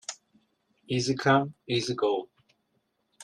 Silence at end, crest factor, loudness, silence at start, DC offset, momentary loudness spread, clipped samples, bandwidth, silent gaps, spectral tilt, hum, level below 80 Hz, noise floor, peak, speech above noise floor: 0 s; 20 dB; -27 LUFS; 0.1 s; under 0.1%; 12 LU; under 0.1%; 11.5 kHz; none; -5 dB/octave; none; -68 dBFS; -75 dBFS; -10 dBFS; 49 dB